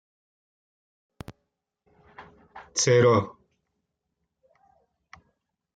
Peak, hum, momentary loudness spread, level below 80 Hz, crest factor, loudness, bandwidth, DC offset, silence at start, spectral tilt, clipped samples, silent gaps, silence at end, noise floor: -8 dBFS; none; 27 LU; -66 dBFS; 22 dB; -22 LUFS; 9.4 kHz; under 0.1%; 2.2 s; -4.5 dB/octave; under 0.1%; none; 2.45 s; -81 dBFS